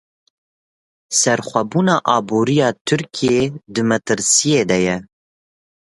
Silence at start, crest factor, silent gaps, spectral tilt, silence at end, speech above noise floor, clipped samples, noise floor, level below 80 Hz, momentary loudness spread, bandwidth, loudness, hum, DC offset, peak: 1.1 s; 18 dB; 2.81-2.85 s; -4 dB/octave; 0.95 s; over 73 dB; under 0.1%; under -90 dBFS; -54 dBFS; 7 LU; 11.5 kHz; -17 LUFS; none; under 0.1%; 0 dBFS